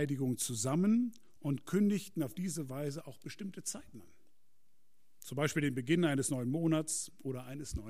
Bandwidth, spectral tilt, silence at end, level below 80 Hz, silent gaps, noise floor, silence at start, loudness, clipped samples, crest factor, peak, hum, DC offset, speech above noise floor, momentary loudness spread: 15.5 kHz; -5 dB/octave; 0 s; -58 dBFS; none; -81 dBFS; 0 s; -35 LUFS; under 0.1%; 18 dB; -18 dBFS; none; 0.2%; 46 dB; 13 LU